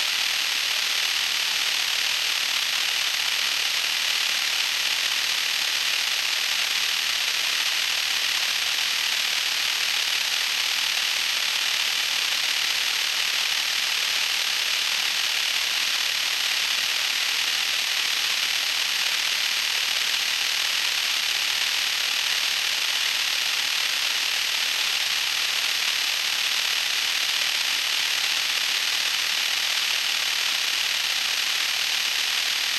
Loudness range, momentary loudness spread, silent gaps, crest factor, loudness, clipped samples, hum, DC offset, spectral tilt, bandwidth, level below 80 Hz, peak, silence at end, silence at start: 0 LU; 0 LU; none; 16 dB; -21 LUFS; under 0.1%; none; under 0.1%; 3 dB/octave; 16 kHz; -70 dBFS; -8 dBFS; 0 s; 0 s